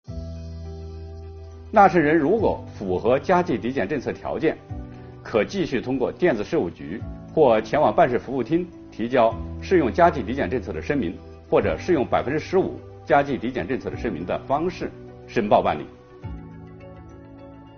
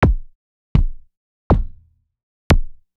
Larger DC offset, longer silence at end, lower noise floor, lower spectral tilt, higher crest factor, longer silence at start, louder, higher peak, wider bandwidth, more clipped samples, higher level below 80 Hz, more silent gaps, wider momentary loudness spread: neither; second, 0 s vs 0.3 s; second, -43 dBFS vs -49 dBFS; second, -5.5 dB/octave vs -7 dB/octave; about the same, 20 dB vs 16 dB; about the same, 0.1 s vs 0 s; about the same, -22 LUFS vs -21 LUFS; about the same, -2 dBFS vs -4 dBFS; second, 6.8 kHz vs 13.5 kHz; neither; second, -44 dBFS vs -22 dBFS; second, none vs 0.35-0.75 s, 1.17-1.50 s, 2.23-2.50 s; first, 21 LU vs 10 LU